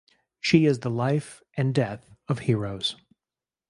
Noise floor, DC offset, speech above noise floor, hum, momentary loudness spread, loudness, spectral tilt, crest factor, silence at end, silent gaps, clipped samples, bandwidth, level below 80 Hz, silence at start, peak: under -90 dBFS; under 0.1%; over 66 dB; none; 12 LU; -25 LUFS; -6.5 dB/octave; 22 dB; 0.75 s; none; under 0.1%; 11.5 kHz; -60 dBFS; 0.45 s; -4 dBFS